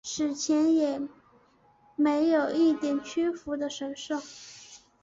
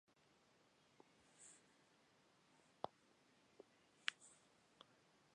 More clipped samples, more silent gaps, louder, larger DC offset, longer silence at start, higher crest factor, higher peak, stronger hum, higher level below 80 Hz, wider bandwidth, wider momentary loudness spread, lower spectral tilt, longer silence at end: neither; neither; first, -27 LUFS vs -53 LUFS; neither; about the same, 0.05 s vs 0.1 s; second, 14 dB vs 40 dB; first, -14 dBFS vs -20 dBFS; neither; first, -68 dBFS vs under -90 dBFS; second, 7.8 kHz vs 11 kHz; about the same, 18 LU vs 20 LU; first, -3.5 dB/octave vs -1 dB/octave; first, 0.25 s vs 0 s